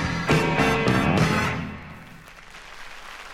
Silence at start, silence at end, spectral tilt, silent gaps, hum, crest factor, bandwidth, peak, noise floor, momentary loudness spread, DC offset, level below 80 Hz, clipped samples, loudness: 0 s; 0 s; -5.5 dB/octave; none; none; 18 dB; 16 kHz; -8 dBFS; -44 dBFS; 22 LU; under 0.1%; -42 dBFS; under 0.1%; -21 LUFS